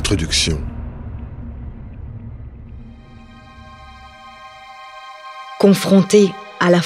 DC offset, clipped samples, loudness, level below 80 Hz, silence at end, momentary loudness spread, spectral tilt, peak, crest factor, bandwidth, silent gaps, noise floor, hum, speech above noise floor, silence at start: under 0.1%; under 0.1%; -15 LUFS; -34 dBFS; 0 s; 26 LU; -5 dB/octave; 0 dBFS; 18 dB; 15.5 kHz; none; -40 dBFS; none; 26 dB; 0 s